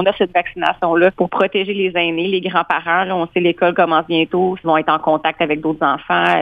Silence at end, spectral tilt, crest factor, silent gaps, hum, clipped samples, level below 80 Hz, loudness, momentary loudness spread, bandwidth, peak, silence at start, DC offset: 0 s; -7 dB/octave; 14 dB; none; none; under 0.1%; -54 dBFS; -16 LUFS; 4 LU; 5 kHz; -2 dBFS; 0 s; under 0.1%